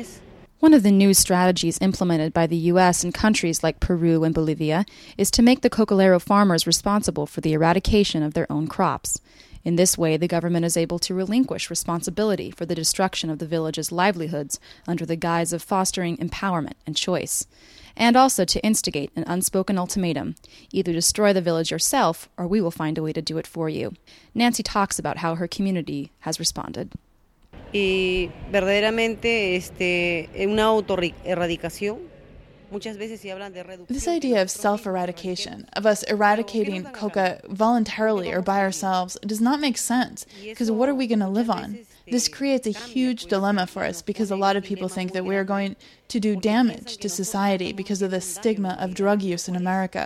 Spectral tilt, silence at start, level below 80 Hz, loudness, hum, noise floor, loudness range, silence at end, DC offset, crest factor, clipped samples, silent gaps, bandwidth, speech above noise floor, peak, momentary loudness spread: -4.5 dB/octave; 0 s; -44 dBFS; -22 LUFS; none; -56 dBFS; 6 LU; 0 s; under 0.1%; 20 dB; under 0.1%; none; 16 kHz; 34 dB; -4 dBFS; 11 LU